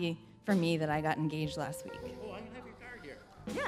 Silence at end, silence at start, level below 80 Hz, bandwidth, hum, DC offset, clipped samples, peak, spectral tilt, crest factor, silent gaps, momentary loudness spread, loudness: 0 s; 0 s; -62 dBFS; 15 kHz; none; under 0.1%; under 0.1%; -16 dBFS; -6 dB/octave; 20 dB; none; 17 LU; -35 LUFS